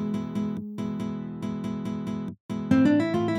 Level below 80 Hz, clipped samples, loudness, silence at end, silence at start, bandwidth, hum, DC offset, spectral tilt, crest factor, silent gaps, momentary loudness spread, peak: -60 dBFS; under 0.1%; -28 LUFS; 0 s; 0 s; 11 kHz; none; under 0.1%; -8 dB/octave; 18 dB; 2.40-2.49 s; 12 LU; -10 dBFS